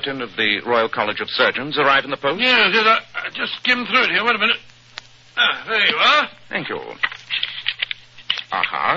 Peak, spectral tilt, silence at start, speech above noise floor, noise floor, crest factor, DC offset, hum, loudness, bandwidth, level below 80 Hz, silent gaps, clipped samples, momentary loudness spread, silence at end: -2 dBFS; -3.5 dB/octave; 0 s; 22 dB; -41 dBFS; 18 dB; under 0.1%; none; -18 LUFS; 7.6 kHz; -60 dBFS; none; under 0.1%; 12 LU; 0 s